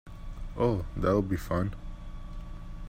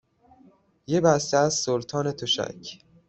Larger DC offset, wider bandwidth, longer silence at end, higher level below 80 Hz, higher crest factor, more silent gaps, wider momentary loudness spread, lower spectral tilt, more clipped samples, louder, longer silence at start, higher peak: neither; first, 16 kHz vs 8.4 kHz; second, 0 s vs 0.3 s; first, -40 dBFS vs -62 dBFS; about the same, 18 dB vs 22 dB; neither; first, 18 LU vs 13 LU; first, -8 dB/octave vs -4 dB/octave; neither; second, -30 LUFS vs -24 LUFS; second, 0.05 s vs 0.9 s; second, -14 dBFS vs -4 dBFS